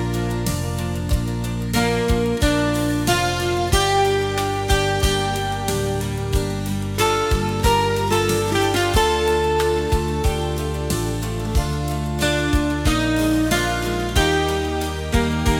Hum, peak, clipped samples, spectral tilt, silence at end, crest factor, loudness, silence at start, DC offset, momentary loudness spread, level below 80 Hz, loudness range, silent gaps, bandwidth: none; -4 dBFS; under 0.1%; -5 dB/octave; 0 s; 16 dB; -20 LUFS; 0 s; under 0.1%; 6 LU; -28 dBFS; 2 LU; none; 18 kHz